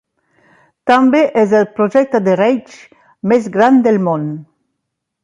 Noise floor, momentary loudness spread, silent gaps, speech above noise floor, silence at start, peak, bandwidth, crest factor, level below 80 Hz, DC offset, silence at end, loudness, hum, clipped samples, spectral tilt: -75 dBFS; 12 LU; none; 62 dB; 0.85 s; 0 dBFS; 9.6 kHz; 14 dB; -62 dBFS; under 0.1%; 0.8 s; -13 LUFS; none; under 0.1%; -7 dB/octave